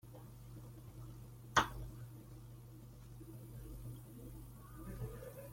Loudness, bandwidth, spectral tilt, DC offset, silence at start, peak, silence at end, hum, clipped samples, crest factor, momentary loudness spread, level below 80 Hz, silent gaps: -45 LUFS; 16.5 kHz; -4 dB/octave; under 0.1%; 0.05 s; -16 dBFS; 0 s; none; under 0.1%; 32 dB; 20 LU; -58 dBFS; none